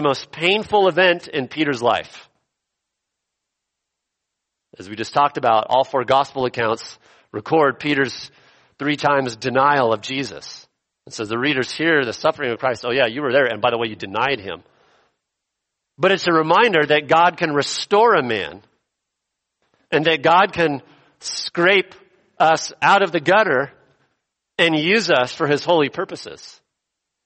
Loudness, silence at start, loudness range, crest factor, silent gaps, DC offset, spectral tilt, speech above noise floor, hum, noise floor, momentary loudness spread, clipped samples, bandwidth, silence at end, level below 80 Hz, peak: -18 LUFS; 0 s; 5 LU; 18 dB; none; under 0.1%; -4.5 dB/octave; 62 dB; none; -81 dBFS; 15 LU; under 0.1%; 8.8 kHz; 0.75 s; -62 dBFS; -2 dBFS